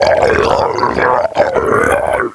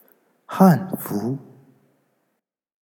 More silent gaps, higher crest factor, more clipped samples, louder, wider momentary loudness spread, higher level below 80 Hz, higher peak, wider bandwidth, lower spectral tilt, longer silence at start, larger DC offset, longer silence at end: neither; second, 12 dB vs 22 dB; neither; first, -12 LUFS vs -20 LUFS; second, 3 LU vs 17 LU; first, -34 dBFS vs -74 dBFS; about the same, 0 dBFS vs -2 dBFS; second, 11 kHz vs 18.5 kHz; second, -5 dB/octave vs -8 dB/octave; second, 0 s vs 0.5 s; neither; second, 0 s vs 1.45 s